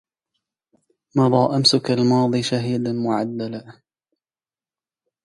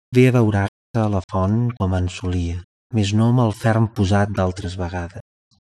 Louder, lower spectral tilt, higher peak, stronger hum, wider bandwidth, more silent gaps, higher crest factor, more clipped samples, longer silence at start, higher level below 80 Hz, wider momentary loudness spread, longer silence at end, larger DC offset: about the same, -19 LUFS vs -20 LUFS; second, -5.5 dB/octave vs -7.5 dB/octave; about the same, -2 dBFS vs -2 dBFS; neither; about the same, 11.5 kHz vs 12 kHz; second, none vs 0.68-0.94 s, 1.24-1.29 s, 2.64-2.90 s; about the same, 20 dB vs 16 dB; neither; first, 1.15 s vs 0.1 s; second, -64 dBFS vs -42 dBFS; about the same, 11 LU vs 11 LU; first, 1.55 s vs 0.4 s; neither